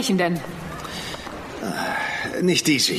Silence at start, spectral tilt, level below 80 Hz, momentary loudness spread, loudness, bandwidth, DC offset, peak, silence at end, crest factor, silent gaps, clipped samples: 0 s; -3.5 dB/octave; -50 dBFS; 14 LU; -24 LUFS; 15.5 kHz; under 0.1%; -6 dBFS; 0 s; 18 dB; none; under 0.1%